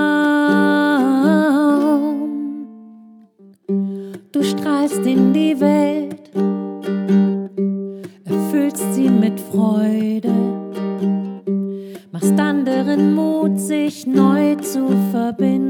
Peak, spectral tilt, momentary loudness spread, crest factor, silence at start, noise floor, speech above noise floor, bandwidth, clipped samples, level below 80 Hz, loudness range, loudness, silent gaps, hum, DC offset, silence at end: -2 dBFS; -6.5 dB/octave; 10 LU; 14 dB; 0 s; -47 dBFS; 33 dB; 17.5 kHz; under 0.1%; -74 dBFS; 3 LU; -17 LUFS; none; none; under 0.1%; 0 s